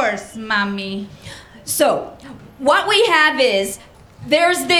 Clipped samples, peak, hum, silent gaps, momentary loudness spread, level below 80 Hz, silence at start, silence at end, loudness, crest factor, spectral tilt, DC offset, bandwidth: under 0.1%; 0 dBFS; none; none; 21 LU; -52 dBFS; 0 s; 0 s; -17 LUFS; 18 dB; -2.5 dB/octave; under 0.1%; 19.5 kHz